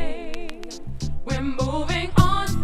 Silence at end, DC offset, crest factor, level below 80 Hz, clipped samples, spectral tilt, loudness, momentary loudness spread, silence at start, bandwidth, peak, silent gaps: 0 s; under 0.1%; 20 dB; -30 dBFS; under 0.1%; -5.5 dB/octave; -24 LUFS; 16 LU; 0 s; 14 kHz; -2 dBFS; none